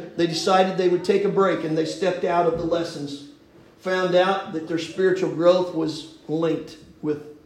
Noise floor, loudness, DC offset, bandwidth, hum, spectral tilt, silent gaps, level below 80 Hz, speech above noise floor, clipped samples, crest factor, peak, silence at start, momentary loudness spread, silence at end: -51 dBFS; -22 LUFS; under 0.1%; 12 kHz; none; -5.5 dB/octave; none; -58 dBFS; 29 dB; under 0.1%; 18 dB; -6 dBFS; 0 s; 12 LU; 0.15 s